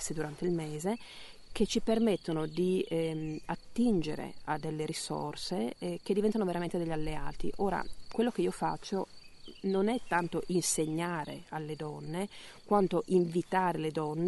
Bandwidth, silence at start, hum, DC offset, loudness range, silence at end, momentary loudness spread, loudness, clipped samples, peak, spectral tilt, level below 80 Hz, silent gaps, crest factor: 11.5 kHz; 0 s; none; under 0.1%; 2 LU; 0 s; 11 LU; -33 LUFS; under 0.1%; -14 dBFS; -5 dB/octave; -52 dBFS; none; 18 dB